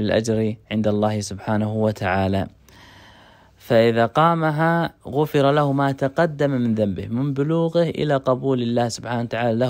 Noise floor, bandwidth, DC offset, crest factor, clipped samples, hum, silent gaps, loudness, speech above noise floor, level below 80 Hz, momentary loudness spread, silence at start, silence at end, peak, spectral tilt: -50 dBFS; 16 kHz; under 0.1%; 16 dB; under 0.1%; none; none; -21 LUFS; 30 dB; -54 dBFS; 7 LU; 0 s; 0 s; -4 dBFS; -6.5 dB/octave